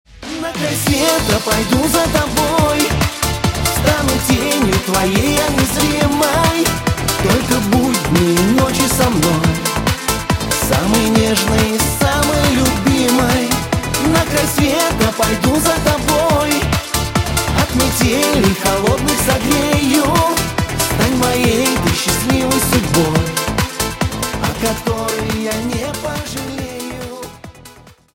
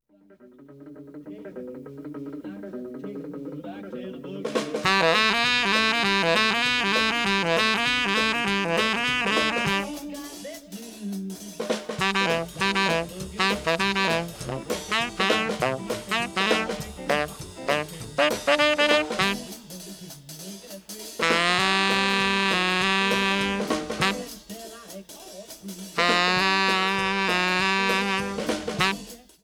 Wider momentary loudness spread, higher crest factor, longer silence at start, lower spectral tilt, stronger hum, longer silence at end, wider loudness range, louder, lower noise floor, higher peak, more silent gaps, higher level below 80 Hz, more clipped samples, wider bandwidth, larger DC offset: second, 6 LU vs 19 LU; second, 14 dB vs 22 dB; second, 0.1 s vs 0.4 s; about the same, -4 dB/octave vs -3 dB/octave; neither; first, 0.4 s vs 0.25 s; second, 3 LU vs 6 LU; first, -15 LUFS vs -23 LUFS; second, -41 dBFS vs -54 dBFS; first, 0 dBFS vs -4 dBFS; neither; first, -30 dBFS vs -54 dBFS; neither; about the same, 17 kHz vs 18.5 kHz; neither